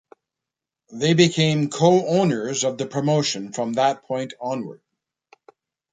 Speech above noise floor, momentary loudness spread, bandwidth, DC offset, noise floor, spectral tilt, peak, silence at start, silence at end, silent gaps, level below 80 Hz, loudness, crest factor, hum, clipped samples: 66 dB; 12 LU; 9.6 kHz; under 0.1%; -87 dBFS; -5 dB/octave; -2 dBFS; 0.9 s; 1.15 s; none; -64 dBFS; -21 LUFS; 20 dB; none; under 0.1%